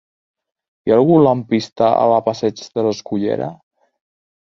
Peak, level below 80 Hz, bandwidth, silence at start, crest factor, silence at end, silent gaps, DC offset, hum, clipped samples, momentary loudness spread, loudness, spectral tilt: -2 dBFS; -58 dBFS; 7.4 kHz; 0.85 s; 16 dB; 1 s; 1.72-1.76 s; under 0.1%; none; under 0.1%; 10 LU; -16 LUFS; -7 dB/octave